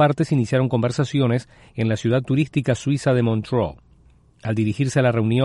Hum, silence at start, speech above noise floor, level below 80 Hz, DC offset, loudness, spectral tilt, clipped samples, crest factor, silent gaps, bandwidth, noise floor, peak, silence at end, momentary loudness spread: none; 0 s; 34 dB; -50 dBFS; under 0.1%; -21 LUFS; -7 dB/octave; under 0.1%; 14 dB; none; 11.5 kHz; -53 dBFS; -6 dBFS; 0 s; 7 LU